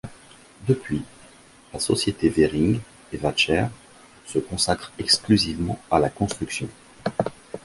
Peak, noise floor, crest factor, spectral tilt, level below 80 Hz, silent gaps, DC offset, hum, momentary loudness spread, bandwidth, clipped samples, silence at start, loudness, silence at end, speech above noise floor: -4 dBFS; -50 dBFS; 22 dB; -4.5 dB/octave; -46 dBFS; none; under 0.1%; none; 12 LU; 11.5 kHz; under 0.1%; 0.05 s; -23 LUFS; 0.05 s; 27 dB